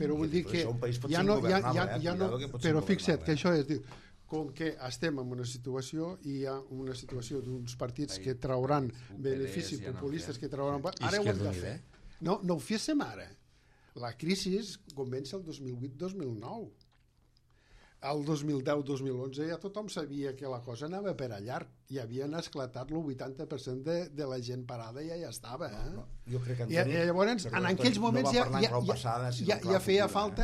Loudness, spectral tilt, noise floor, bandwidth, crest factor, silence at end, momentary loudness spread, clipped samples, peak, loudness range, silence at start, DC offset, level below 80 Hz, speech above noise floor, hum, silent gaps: -34 LUFS; -5.5 dB/octave; -67 dBFS; 14 kHz; 20 dB; 0 s; 13 LU; under 0.1%; -12 dBFS; 9 LU; 0 s; under 0.1%; -56 dBFS; 34 dB; none; none